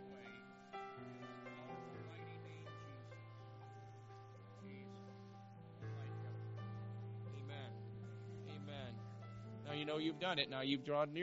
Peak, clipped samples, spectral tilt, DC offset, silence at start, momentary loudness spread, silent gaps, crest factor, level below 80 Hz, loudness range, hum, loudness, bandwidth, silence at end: -22 dBFS; under 0.1%; -4 dB/octave; under 0.1%; 0 s; 17 LU; none; 26 dB; -78 dBFS; 11 LU; none; -48 LUFS; 7.6 kHz; 0 s